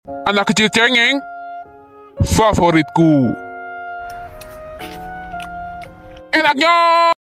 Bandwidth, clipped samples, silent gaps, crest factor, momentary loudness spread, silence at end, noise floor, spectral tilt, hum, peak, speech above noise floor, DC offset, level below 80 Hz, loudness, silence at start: 16 kHz; under 0.1%; none; 14 dB; 21 LU; 0.1 s; -41 dBFS; -4.5 dB/octave; none; -2 dBFS; 28 dB; under 0.1%; -36 dBFS; -14 LUFS; 0.05 s